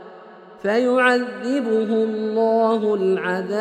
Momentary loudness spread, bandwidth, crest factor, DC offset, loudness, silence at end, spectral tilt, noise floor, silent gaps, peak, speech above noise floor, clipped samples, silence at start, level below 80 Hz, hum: 6 LU; 9.8 kHz; 16 dB; under 0.1%; -20 LUFS; 0 s; -6 dB/octave; -43 dBFS; none; -4 dBFS; 23 dB; under 0.1%; 0 s; -70 dBFS; none